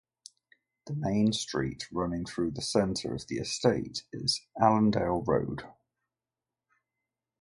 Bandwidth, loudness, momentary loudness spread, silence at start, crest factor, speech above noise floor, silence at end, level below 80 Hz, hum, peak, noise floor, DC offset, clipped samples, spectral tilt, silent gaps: 11.5 kHz; -30 LUFS; 9 LU; 0.85 s; 22 dB; over 61 dB; 1.7 s; -56 dBFS; none; -8 dBFS; under -90 dBFS; under 0.1%; under 0.1%; -5 dB/octave; none